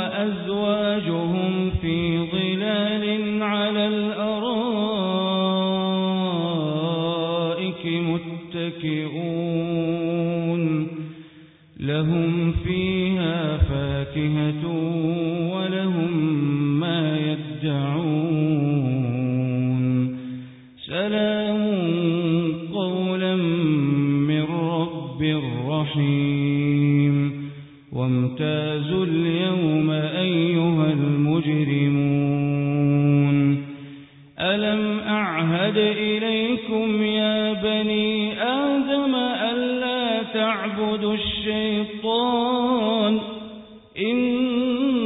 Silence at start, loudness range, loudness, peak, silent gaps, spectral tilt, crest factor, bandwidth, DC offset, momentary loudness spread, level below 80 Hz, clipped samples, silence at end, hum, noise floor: 0 s; 3 LU; -22 LUFS; -8 dBFS; none; -11.5 dB/octave; 14 dB; 4 kHz; under 0.1%; 6 LU; -44 dBFS; under 0.1%; 0 s; none; -48 dBFS